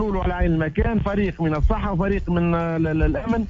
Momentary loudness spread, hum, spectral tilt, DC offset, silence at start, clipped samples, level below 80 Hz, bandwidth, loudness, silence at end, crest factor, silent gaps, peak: 1 LU; none; -9.5 dB/octave; under 0.1%; 0 s; under 0.1%; -26 dBFS; 7.2 kHz; -22 LUFS; 0 s; 14 dB; none; -8 dBFS